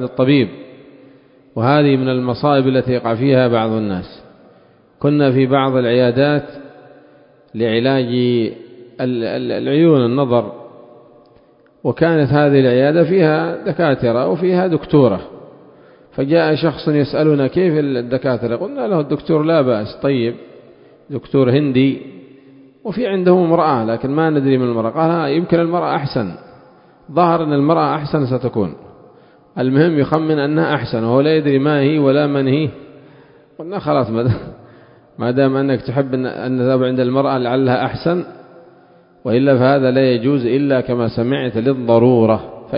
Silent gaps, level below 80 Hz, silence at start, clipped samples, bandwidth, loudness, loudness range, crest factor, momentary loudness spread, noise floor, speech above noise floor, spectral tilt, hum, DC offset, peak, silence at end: none; -50 dBFS; 0 s; under 0.1%; 5.4 kHz; -16 LUFS; 4 LU; 16 dB; 10 LU; -50 dBFS; 35 dB; -11 dB/octave; none; under 0.1%; 0 dBFS; 0 s